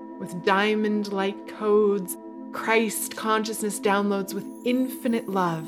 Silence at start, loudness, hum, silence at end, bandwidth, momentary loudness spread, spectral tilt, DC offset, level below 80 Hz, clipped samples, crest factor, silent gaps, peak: 0 s; -25 LUFS; none; 0 s; 17 kHz; 10 LU; -4.5 dB/octave; under 0.1%; -76 dBFS; under 0.1%; 20 dB; none; -6 dBFS